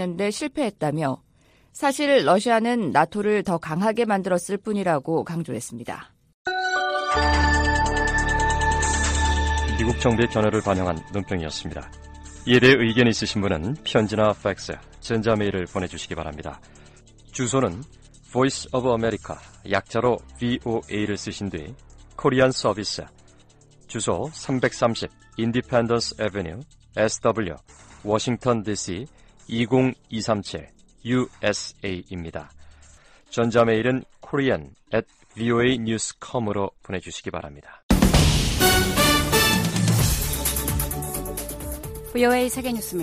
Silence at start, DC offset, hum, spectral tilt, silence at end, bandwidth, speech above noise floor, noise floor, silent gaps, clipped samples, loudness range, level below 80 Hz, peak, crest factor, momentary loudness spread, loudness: 0 s; under 0.1%; none; -4.5 dB/octave; 0 s; 15.5 kHz; 34 dB; -58 dBFS; 6.34-6.45 s, 37.83-37.89 s; under 0.1%; 6 LU; -34 dBFS; -4 dBFS; 20 dB; 15 LU; -23 LUFS